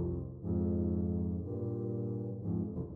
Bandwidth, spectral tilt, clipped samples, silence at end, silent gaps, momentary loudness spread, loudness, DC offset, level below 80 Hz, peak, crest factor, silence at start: 1.7 kHz; -14.5 dB/octave; under 0.1%; 0 s; none; 5 LU; -36 LUFS; under 0.1%; -50 dBFS; -24 dBFS; 12 dB; 0 s